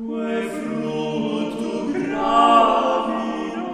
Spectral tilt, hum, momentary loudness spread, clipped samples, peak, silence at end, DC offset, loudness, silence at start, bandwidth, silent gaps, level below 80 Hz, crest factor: -5.5 dB/octave; none; 12 LU; under 0.1%; -2 dBFS; 0 s; under 0.1%; -20 LUFS; 0 s; 13 kHz; none; -52 dBFS; 18 dB